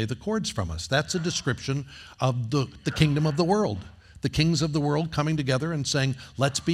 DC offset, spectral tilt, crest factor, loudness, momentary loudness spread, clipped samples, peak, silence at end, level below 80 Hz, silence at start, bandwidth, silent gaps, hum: under 0.1%; -5 dB/octave; 20 dB; -26 LUFS; 7 LU; under 0.1%; -6 dBFS; 0 s; -48 dBFS; 0 s; 13.5 kHz; none; none